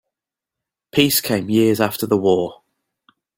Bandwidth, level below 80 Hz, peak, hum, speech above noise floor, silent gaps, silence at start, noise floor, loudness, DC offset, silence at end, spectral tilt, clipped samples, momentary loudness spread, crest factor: 17 kHz; -56 dBFS; -2 dBFS; none; 69 dB; none; 0.95 s; -86 dBFS; -18 LUFS; under 0.1%; 0.85 s; -4.5 dB/octave; under 0.1%; 5 LU; 18 dB